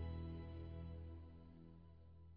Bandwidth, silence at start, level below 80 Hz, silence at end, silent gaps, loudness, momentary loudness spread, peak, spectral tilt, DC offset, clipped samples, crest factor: 4.9 kHz; 0 s; -58 dBFS; 0 s; none; -55 LUFS; 13 LU; -38 dBFS; -8 dB/octave; under 0.1%; under 0.1%; 14 dB